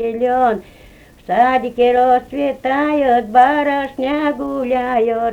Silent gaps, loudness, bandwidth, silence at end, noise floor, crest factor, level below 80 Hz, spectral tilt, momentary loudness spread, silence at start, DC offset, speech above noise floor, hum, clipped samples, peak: none; -16 LUFS; 9.4 kHz; 0 s; -43 dBFS; 14 dB; -48 dBFS; -6 dB/octave; 8 LU; 0 s; under 0.1%; 28 dB; none; under 0.1%; 0 dBFS